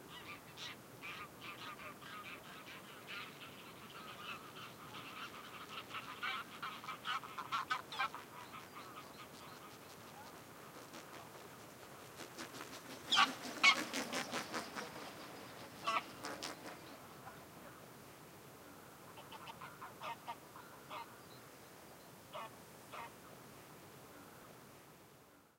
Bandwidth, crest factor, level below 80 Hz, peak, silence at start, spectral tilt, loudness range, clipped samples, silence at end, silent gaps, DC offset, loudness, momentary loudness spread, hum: 16.5 kHz; 30 dB; -80 dBFS; -16 dBFS; 0 s; -2 dB/octave; 17 LU; under 0.1%; 0.1 s; none; under 0.1%; -43 LUFS; 17 LU; none